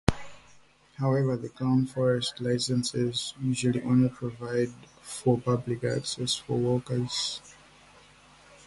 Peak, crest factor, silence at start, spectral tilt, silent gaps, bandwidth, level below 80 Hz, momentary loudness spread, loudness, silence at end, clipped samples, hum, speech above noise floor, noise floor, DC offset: -4 dBFS; 26 dB; 0.1 s; -5.5 dB/octave; none; 11.5 kHz; -50 dBFS; 7 LU; -28 LUFS; 1.15 s; under 0.1%; none; 30 dB; -58 dBFS; under 0.1%